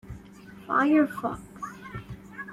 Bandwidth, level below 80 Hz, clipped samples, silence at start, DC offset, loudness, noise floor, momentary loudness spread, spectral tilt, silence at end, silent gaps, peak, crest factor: 13 kHz; -54 dBFS; under 0.1%; 0.05 s; under 0.1%; -26 LUFS; -47 dBFS; 23 LU; -7 dB/octave; 0 s; none; -10 dBFS; 18 dB